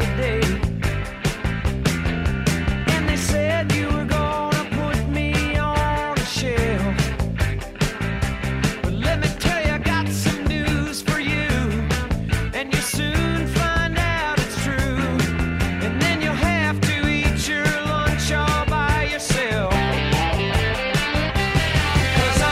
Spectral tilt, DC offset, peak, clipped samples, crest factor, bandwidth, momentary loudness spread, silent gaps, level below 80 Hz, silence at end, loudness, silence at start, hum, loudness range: -5 dB/octave; under 0.1%; -6 dBFS; under 0.1%; 16 dB; 16 kHz; 4 LU; none; -28 dBFS; 0 s; -21 LUFS; 0 s; none; 2 LU